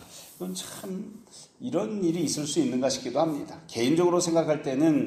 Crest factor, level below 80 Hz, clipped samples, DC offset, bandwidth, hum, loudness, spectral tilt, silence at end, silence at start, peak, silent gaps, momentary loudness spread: 16 dB; -68 dBFS; under 0.1%; under 0.1%; 15.5 kHz; none; -27 LUFS; -5 dB/octave; 0 s; 0 s; -12 dBFS; none; 15 LU